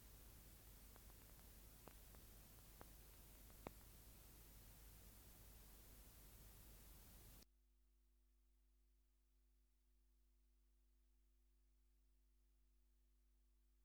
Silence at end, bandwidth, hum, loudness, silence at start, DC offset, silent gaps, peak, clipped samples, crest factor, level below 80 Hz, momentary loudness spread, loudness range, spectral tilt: 0 s; over 20 kHz; none; -64 LUFS; 0 s; under 0.1%; none; -36 dBFS; under 0.1%; 32 dB; -70 dBFS; 2 LU; 4 LU; -3.5 dB/octave